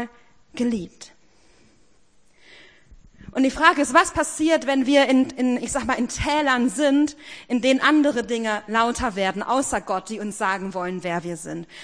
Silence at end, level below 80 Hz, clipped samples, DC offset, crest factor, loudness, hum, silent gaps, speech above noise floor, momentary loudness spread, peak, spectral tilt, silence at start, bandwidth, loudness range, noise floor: 0 s; -48 dBFS; under 0.1%; 0.2%; 22 dB; -21 LUFS; none; none; 39 dB; 13 LU; -2 dBFS; -3.5 dB/octave; 0 s; 10.5 kHz; 6 LU; -61 dBFS